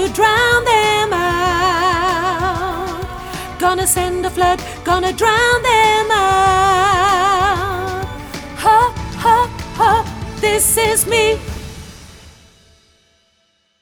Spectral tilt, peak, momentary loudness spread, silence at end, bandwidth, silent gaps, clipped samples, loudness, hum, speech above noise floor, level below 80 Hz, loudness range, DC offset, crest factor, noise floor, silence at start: -3 dB/octave; 0 dBFS; 13 LU; 1.5 s; over 20 kHz; none; under 0.1%; -14 LUFS; none; 47 dB; -34 dBFS; 4 LU; under 0.1%; 16 dB; -61 dBFS; 0 s